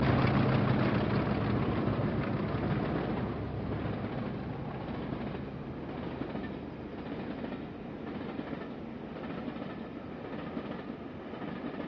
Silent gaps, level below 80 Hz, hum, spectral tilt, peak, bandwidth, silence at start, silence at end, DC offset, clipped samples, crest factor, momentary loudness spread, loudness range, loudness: none; -50 dBFS; none; -6.5 dB/octave; -14 dBFS; 5.8 kHz; 0 s; 0 s; under 0.1%; under 0.1%; 20 dB; 13 LU; 9 LU; -35 LUFS